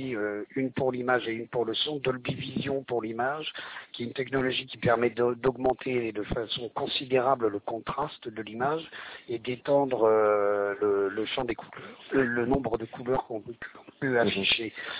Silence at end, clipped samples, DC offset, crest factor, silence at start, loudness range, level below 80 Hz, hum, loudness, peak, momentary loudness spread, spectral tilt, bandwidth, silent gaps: 0 s; under 0.1%; under 0.1%; 18 dB; 0 s; 3 LU; -56 dBFS; none; -29 LUFS; -10 dBFS; 12 LU; -9 dB/octave; 4 kHz; none